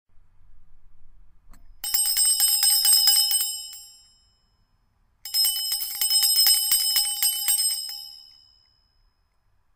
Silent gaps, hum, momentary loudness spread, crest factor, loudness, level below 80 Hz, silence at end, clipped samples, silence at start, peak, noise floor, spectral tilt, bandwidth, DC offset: none; none; 18 LU; 22 dB; -19 LUFS; -56 dBFS; 1.55 s; under 0.1%; 0.15 s; -4 dBFS; -66 dBFS; 5 dB/octave; 16.5 kHz; under 0.1%